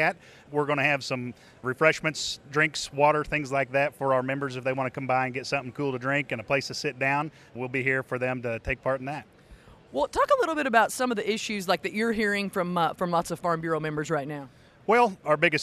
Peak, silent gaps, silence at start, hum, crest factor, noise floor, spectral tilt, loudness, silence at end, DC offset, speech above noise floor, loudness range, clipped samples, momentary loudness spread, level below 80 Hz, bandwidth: -6 dBFS; none; 0 s; none; 20 dB; -52 dBFS; -4.5 dB/octave; -27 LUFS; 0 s; under 0.1%; 25 dB; 3 LU; under 0.1%; 9 LU; -54 dBFS; 13.5 kHz